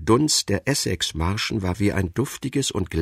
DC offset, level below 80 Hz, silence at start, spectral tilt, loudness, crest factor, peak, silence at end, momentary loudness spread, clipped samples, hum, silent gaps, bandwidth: under 0.1%; -40 dBFS; 0 s; -4 dB/octave; -23 LUFS; 18 dB; -4 dBFS; 0 s; 7 LU; under 0.1%; none; none; 16 kHz